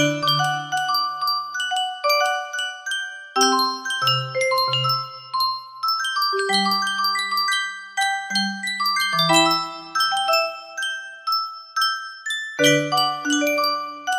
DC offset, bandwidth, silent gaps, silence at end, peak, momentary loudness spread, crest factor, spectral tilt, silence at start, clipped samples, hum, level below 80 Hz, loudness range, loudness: under 0.1%; 16 kHz; none; 0 s; -4 dBFS; 9 LU; 18 dB; -2.5 dB/octave; 0 s; under 0.1%; none; -72 dBFS; 2 LU; -21 LUFS